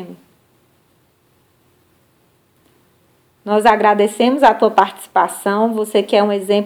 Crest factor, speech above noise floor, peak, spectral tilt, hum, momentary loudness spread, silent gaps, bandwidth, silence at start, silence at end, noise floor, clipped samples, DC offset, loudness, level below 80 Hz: 18 dB; 44 dB; 0 dBFS; -4.5 dB/octave; none; 6 LU; none; 19.5 kHz; 0 s; 0 s; -58 dBFS; under 0.1%; under 0.1%; -15 LUFS; -60 dBFS